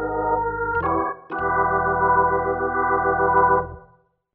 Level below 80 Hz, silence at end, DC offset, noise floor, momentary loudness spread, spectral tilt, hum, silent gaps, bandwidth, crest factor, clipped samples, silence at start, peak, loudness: -42 dBFS; 0.55 s; under 0.1%; -57 dBFS; 6 LU; -7 dB/octave; none; none; 3.5 kHz; 16 dB; under 0.1%; 0 s; -6 dBFS; -21 LUFS